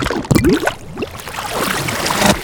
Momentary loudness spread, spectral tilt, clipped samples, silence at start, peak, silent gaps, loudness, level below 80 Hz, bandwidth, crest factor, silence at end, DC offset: 12 LU; -4 dB/octave; under 0.1%; 0 s; 0 dBFS; none; -17 LUFS; -32 dBFS; over 20 kHz; 16 dB; 0 s; under 0.1%